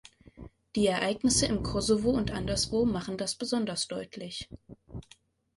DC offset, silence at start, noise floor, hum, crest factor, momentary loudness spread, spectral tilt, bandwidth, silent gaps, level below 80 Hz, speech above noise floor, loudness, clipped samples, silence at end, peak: under 0.1%; 0.35 s; -61 dBFS; none; 18 dB; 18 LU; -4 dB/octave; 11.5 kHz; none; -48 dBFS; 32 dB; -29 LUFS; under 0.1%; 0.55 s; -12 dBFS